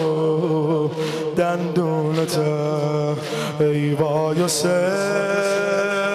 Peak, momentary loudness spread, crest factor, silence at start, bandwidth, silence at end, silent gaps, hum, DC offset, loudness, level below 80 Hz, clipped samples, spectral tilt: -8 dBFS; 4 LU; 12 dB; 0 s; 15 kHz; 0 s; none; none; under 0.1%; -20 LUFS; -62 dBFS; under 0.1%; -5.5 dB/octave